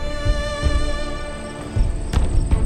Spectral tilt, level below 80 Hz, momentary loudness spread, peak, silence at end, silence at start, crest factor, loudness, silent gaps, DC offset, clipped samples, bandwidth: -5.5 dB/octave; -22 dBFS; 8 LU; -6 dBFS; 0 s; 0 s; 14 dB; -24 LUFS; none; under 0.1%; under 0.1%; 11 kHz